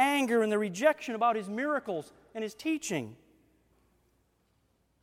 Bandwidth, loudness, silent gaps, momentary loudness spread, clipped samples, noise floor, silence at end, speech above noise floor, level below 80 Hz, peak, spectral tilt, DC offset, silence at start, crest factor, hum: 16.5 kHz; -30 LUFS; none; 12 LU; under 0.1%; -72 dBFS; 1.9 s; 41 dB; -74 dBFS; -12 dBFS; -4 dB/octave; under 0.1%; 0 s; 20 dB; none